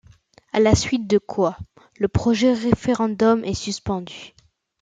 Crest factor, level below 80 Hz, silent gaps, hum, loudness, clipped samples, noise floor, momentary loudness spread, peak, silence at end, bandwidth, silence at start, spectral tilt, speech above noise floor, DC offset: 18 dB; -42 dBFS; none; none; -21 LUFS; under 0.1%; -53 dBFS; 10 LU; -2 dBFS; 0.55 s; 9.2 kHz; 0.55 s; -5.5 dB/octave; 33 dB; under 0.1%